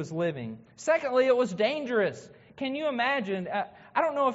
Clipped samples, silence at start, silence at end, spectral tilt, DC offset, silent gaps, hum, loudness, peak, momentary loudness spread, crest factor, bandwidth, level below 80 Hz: under 0.1%; 0 s; 0 s; -3.5 dB/octave; under 0.1%; none; none; -28 LUFS; -12 dBFS; 11 LU; 16 dB; 8 kHz; -72 dBFS